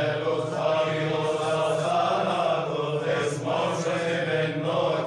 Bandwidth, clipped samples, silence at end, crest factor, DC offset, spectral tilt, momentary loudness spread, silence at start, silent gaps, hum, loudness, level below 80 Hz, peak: 11 kHz; under 0.1%; 0 s; 12 dB; under 0.1%; -5.5 dB/octave; 3 LU; 0 s; none; none; -25 LUFS; -66 dBFS; -12 dBFS